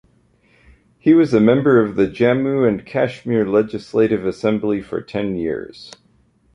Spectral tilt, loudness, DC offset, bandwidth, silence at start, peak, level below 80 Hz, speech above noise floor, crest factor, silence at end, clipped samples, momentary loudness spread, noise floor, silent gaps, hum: -8 dB/octave; -18 LUFS; under 0.1%; 10 kHz; 1.05 s; -2 dBFS; -50 dBFS; 40 dB; 16 dB; 0.65 s; under 0.1%; 10 LU; -57 dBFS; none; none